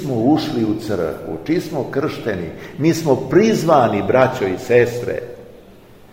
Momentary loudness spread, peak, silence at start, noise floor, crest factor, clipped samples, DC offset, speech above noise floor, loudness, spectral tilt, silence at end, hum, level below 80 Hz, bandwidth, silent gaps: 11 LU; 0 dBFS; 0 s; -43 dBFS; 18 dB; under 0.1%; under 0.1%; 26 dB; -18 LUFS; -6.5 dB/octave; 0.4 s; none; -48 dBFS; 16 kHz; none